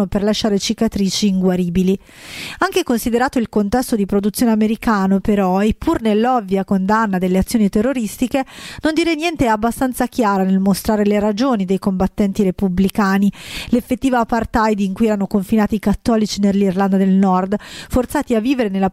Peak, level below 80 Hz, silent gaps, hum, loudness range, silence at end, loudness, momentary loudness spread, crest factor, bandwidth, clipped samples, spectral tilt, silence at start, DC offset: -2 dBFS; -38 dBFS; none; none; 2 LU; 0 s; -17 LUFS; 4 LU; 14 dB; 15 kHz; under 0.1%; -6 dB/octave; 0 s; under 0.1%